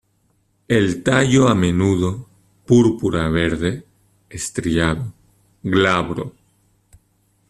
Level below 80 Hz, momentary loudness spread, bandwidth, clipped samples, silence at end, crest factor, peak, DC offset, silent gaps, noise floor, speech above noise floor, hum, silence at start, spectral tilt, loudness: -42 dBFS; 16 LU; 13 kHz; under 0.1%; 1.2 s; 18 dB; -2 dBFS; under 0.1%; none; -63 dBFS; 46 dB; none; 0.7 s; -6 dB/octave; -18 LUFS